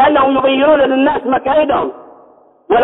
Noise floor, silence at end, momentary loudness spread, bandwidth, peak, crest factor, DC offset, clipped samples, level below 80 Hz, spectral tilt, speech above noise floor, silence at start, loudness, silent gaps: -45 dBFS; 0 s; 6 LU; 4 kHz; -2 dBFS; 12 dB; under 0.1%; under 0.1%; -46 dBFS; -8.5 dB/octave; 33 dB; 0 s; -13 LUFS; none